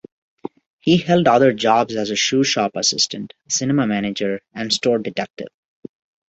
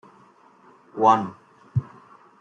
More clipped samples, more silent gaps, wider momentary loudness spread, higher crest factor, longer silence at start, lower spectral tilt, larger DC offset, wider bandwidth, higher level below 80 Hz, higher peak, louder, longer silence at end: neither; first, 5.30-5.34 s vs none; about the same, 19 LU vs 17 LU; about the same, 18 dB vs 22 dB; about the same, 0.85 s vs 0.95 s; second, -4 dB/octave vs -7.5 dB/octave; neither; about the same, 8.2 kHz vs 7.8 kHz; first, -58 dBFS vs -64 dBFS; about the same, -2 dBFS vs -4 dBFS; first, -18 LUFS vs -23 LUFS; first, 0.8 s vs 0.6 s